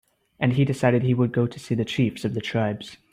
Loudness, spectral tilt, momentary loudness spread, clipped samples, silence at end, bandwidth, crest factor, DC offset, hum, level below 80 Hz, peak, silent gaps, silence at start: -24 LUFS; -7 dB/octave; 7 LU; under 0.1%; 0.2 s; 11.5 kHz; 16 dB; under 0.1%; none; -58 dBFS; -6 dBFS; none; 0.4 s